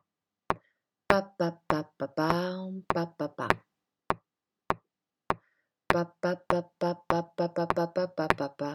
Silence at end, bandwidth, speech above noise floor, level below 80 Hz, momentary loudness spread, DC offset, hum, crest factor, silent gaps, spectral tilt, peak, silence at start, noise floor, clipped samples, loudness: 0 s; 19 kHz; 54 dB; -56 dBFS; 8 LU; under 0.1%; none; 32 dB; none; -6.5 dB/octave; 0 dBFS; 0.5 s; -84 dBFS; under 0.1%; -31 LUFS